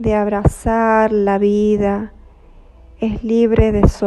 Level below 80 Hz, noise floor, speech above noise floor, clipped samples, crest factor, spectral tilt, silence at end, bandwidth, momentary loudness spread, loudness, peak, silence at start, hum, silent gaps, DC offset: -26 dBFS; -43 dBFS; 28 dB; under 0.1%; 14 dB; -8 dB/octave; 0 s; 12.5 kHz; 9 LU; -16 LUFS; 0 dBFS; 0 s; none; none; under 0.1%